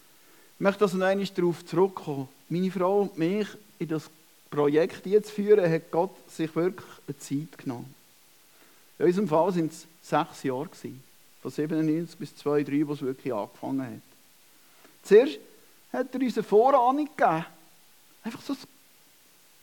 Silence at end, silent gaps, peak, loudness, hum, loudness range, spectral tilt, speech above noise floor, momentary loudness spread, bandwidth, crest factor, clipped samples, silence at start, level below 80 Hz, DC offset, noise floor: 0.95 s; none; -6 dBFS; -27 LUFS; none; 6 LU; -6.5 dB/octave; 33 dB; 17 LU; 18 kHz; 20 dB; under 0.1%; 0.6 s; -82 dBFS; under 0.1%; -59 dBFS